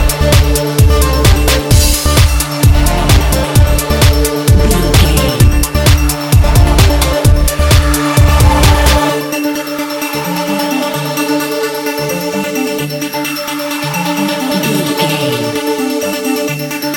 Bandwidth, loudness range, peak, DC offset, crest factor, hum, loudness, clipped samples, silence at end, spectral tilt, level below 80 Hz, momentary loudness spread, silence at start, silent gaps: 17.5 kHz; 6 LU; 0 dBFS; under 0.1%; 10 dB; none; -11 LUFS; 0.3%; 0 s; -4.5 dB/octave; -14 dBFS; 7 LU; 0 s; none